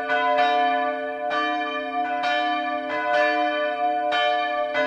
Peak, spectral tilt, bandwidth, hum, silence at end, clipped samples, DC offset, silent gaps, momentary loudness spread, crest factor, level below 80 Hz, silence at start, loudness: -8 dBFS; -3 dB/octave; 7.8 kHz; none; 0 s; under 0.1%; under 0.1%; none; 6 LU; 14 dB; -68 dBFS; 0 s; -23 LUFS